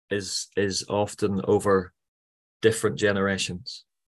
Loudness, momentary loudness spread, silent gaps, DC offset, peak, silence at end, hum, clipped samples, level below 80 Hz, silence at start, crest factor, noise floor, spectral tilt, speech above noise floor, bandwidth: -25 LUFS; 12 LU; 2.08-2.60 s; under 0.1%; -6 dBFS; 0.4 s; none; under 0.1%; -52 dBFS; 0.1 s; 20 dB; under -90 dBFS; -4 dB/octave; over 65 dB; 12.5 kHz